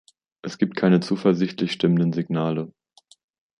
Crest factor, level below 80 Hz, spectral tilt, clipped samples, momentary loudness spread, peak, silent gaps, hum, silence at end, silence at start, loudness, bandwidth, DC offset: 18 dB; -66 dBFS; -7.5 dB/octave; under 0.1%; 14 LU; -4 dBFS; none; none; 0.9 s; 0.45 s; -22 LUFS; 10 kHz; under 0.1%